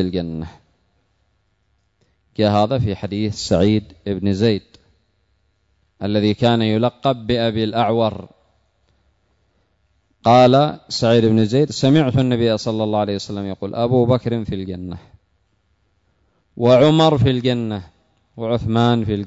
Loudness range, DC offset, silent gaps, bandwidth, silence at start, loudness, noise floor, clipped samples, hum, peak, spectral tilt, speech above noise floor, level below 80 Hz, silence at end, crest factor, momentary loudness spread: 7 LU; under 0.1%; none; 8 kHz; 0 s; -18 LUFS; -65 dBFS; under 0.1%; none; -4 dBFS; -7 dB/octave; 48 dB; -46 dBFS; 0 s; 16 dB; 14 LU